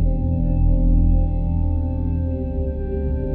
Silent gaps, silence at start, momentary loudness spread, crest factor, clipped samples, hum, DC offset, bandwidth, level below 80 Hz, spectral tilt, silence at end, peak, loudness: none; 0 s; 6 LU; 12 dB; under 0.1%; none; under 0.1%; 2.8 kHz; -20 dBFS; -13.5 dB/octave; 0 s; -8 dBFS; -22 LUFS